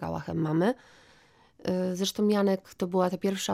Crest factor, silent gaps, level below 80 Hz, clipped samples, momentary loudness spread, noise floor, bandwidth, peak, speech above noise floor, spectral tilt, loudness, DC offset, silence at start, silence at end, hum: 16 dB; none; -62 dBFS; under 0.1%; 7 LU; -60 dBFS; 15.5 kHz; -14 dBFS; 32 dB; -5.5 dB/octave; -28 LUFS; under 0.1%; 0 s; 0 s; none